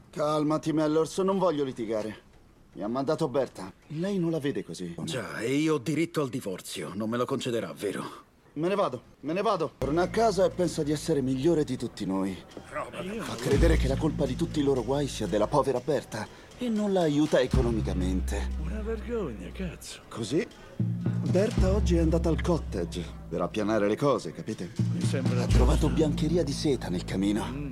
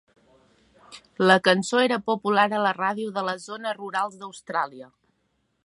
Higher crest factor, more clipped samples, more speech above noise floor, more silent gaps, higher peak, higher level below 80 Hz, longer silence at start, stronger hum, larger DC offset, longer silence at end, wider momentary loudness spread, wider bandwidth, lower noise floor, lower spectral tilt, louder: about the same, 18 dB vs 22 dB; neither; second, 28 dB vs 48 dB; neither; second, -10 dBFS vs -2 dBFS; first, -36 dBFS vs -72 dBFS; second, 0.15 s vs 0.9 s; neither; neither; second, 0 s vs 0.8 s; about the same, 12 LU vs 13 LU; first, 14.5 kHz vs 11.5 kHz; second, -56 dBFS vs -72 dBFS; first, -6.5 dB/octave vs -4.5 dB/octave; second, -28 LUFS vs -24 LUFS